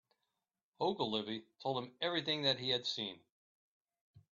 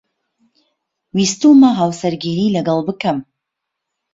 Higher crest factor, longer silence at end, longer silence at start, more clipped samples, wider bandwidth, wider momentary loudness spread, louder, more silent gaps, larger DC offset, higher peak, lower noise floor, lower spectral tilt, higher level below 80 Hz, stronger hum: about the same, 20 dB vs 16 dB; second, 0.1 s vs 0.9 s; second, 0.8 s vs 1.15 s; neither; about the same, 7.4 kHz vs 8 kHz; second, 8 LU vs 11 LU; second, -37 LUFS vs -15 LUFS; first, 3.32-3.85 s, 4.01-4.14 s vs none; neither; second, -20 dBFS vs -2 dBFS; first, under -90 dBFS vs -79 dBFS; second, -2 dB/octave vs -5.5 dB/octave; second, -80 dBFS vs -58 dBFS; neither